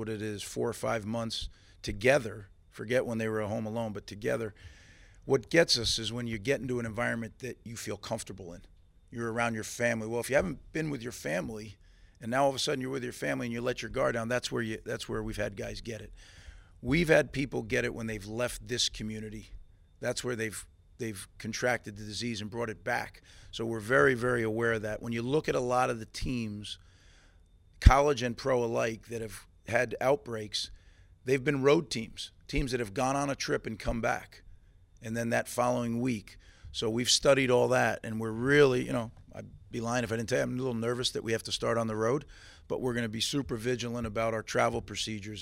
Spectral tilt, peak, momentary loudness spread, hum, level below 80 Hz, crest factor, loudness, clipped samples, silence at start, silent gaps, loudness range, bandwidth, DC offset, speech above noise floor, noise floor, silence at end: -4.5 dB/octave; -2 dBFS; 15 LU; none; -44 dBFS; 28 dB; -31 LUFS; under 0.1%; 0 s; none; 7 LU; 16 kHz; under 0.1%; 29 dB; -60 dBFS; 0 s